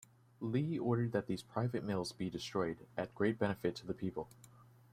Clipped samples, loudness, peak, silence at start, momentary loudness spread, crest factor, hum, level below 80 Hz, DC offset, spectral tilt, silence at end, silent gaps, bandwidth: under 0.1%; -39 LUFS; -20 dBFS; 0.4 s; 8 LU; 20 dB; none; -68 dBFS; under 0.1%; -6.5 dB/octave; 0.3 s; none; 15 kHz